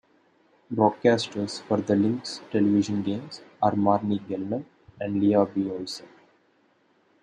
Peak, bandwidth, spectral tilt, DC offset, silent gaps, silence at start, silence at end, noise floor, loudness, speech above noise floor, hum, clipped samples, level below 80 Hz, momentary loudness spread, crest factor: -6 dBFS; 10 kHz; -6.5 dB/octave; under 0.1%; none; 0.7 s; 1.15 s; -65 dBFS; -25 LUFS; 40 dB; none; under 0.1%; -70 dBFS; 12 LU; 20 dB